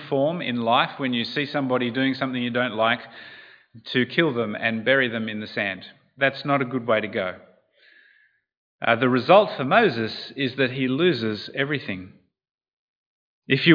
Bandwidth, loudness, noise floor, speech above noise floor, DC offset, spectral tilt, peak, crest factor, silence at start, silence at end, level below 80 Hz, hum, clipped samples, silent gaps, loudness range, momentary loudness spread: 5.2 kHz; -23 LUFS; -61 dBFS; 39 dB; under 0.1%; -7.5 dB/octave; -2 dBFS; 22 dB; 0 s; 0 s; -74 dBFS; none; under 0.1%; 8.57-8.79 s, 12.51-12.58 s, 12.68-13.42 s; 5 LU; 10 LU